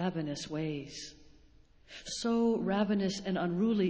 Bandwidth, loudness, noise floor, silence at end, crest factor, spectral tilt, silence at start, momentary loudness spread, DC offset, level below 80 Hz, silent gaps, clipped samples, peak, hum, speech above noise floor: 8 kHz; -33 LUFS; -60 dBFS; 0 s; 16 dB; -5.5 dB/octave; 0 s; 15 LU; under 0.1%; -62 dBFS; none; under 0.1%; -16 dBFS; none; 28 dB